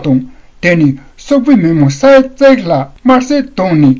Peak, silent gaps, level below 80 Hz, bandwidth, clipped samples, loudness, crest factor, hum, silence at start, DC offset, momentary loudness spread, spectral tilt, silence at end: 0 dBFS; none; -40 dBFS; 7.6 kHz; 0.8%; -9 LUFS; 8 dB; none; 0 s; under 0.1%; 8 LU; -7 dB/octave; 0 s